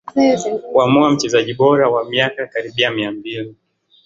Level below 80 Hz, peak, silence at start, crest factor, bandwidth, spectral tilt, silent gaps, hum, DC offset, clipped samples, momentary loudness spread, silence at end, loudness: -58 dBFS; -2 dBFS; 0.05 s; 16 dB; 7.8 kHz; -5 dB/octave; none; none; under 0.1%; under 0.1%; 12 LU; 0.55 s; -16 LUFS